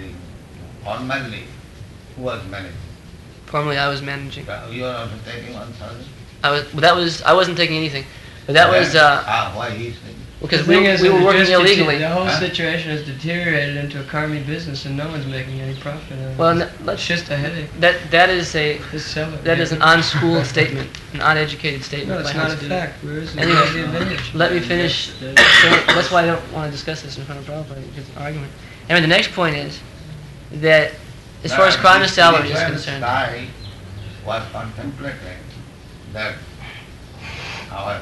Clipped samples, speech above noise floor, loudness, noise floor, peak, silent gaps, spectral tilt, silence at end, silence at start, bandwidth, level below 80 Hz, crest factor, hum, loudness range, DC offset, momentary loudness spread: under 0.1%; 22 dB; -16 LUFS; -39 dBFS; 0 dBFS; none; -4.5 dB/octave; 0 s; 0 s; 12 kHz; -42 dBFS; 18 dB; none; 12 LU; under 0.1%; 22 LU